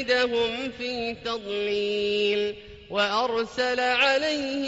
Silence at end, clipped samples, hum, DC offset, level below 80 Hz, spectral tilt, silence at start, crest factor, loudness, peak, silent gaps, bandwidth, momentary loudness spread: 0 s; under 0.1%; none; under 0.1%; -58 dBFS; -0.5 dB/octave; 0 s; 16 dB; -25 LUFS; -10 dBFS; none; 8 kHz; 9 LU